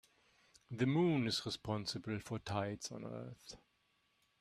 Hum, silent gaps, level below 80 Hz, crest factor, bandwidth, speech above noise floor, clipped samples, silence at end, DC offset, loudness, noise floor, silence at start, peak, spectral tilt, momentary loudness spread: none; none; -70 dBFS; 20 dB; 14.5 kHz; 39 dB; under 0.1%; 0.85 s; under 0.1%; -39 LUFS; -78 dBFS; 0.7 s; -22 dBFS; -5.5 dB/octave; 18 LU